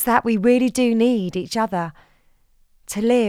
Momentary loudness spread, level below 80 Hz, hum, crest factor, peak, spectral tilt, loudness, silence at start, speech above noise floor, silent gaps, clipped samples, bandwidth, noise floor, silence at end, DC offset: 9 LU; -54 dBFS; none; 18 dB; -2 dBFS; -5 dB/octave; -20 LUFS; 0 s; 38 dB; none; under 0.1%; 16 kHz; -57 dBFS; 0 s; under 0.1%